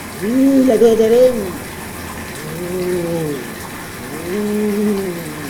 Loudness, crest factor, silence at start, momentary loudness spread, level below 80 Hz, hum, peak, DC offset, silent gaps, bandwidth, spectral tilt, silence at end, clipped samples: -16 LUFS; 16 dB; 0 s; 16 LU; -46 dBFS; none; 0 dBFS; under 0.1%; none; over 20 kHz; -5.5 dB/octave; 0 s; under 0.1%